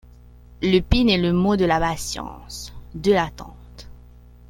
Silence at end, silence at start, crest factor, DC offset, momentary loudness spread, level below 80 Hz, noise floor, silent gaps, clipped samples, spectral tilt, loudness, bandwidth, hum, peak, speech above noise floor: 0.6 s; 0.6 s; 20 dB; under 0.1%; 17 LU; -36 dBFS; -46 dBFS; none; under 0.1%; -5.5 dB/octave; -20 LUFS; 16.5 kHz; 60 Hz at -40 dBFS; -2 dBFS; 25 dB